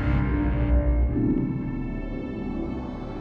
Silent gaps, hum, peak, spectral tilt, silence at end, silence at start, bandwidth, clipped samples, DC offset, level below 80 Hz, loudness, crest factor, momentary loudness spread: none; none; -12 dBFS; -10.5 dB/octave; 0 s; 0 s; 4.6 kHz; under 0.1%; under 0.1%; -28 dBFS; -27 LUFS; 14 dB; 9 LU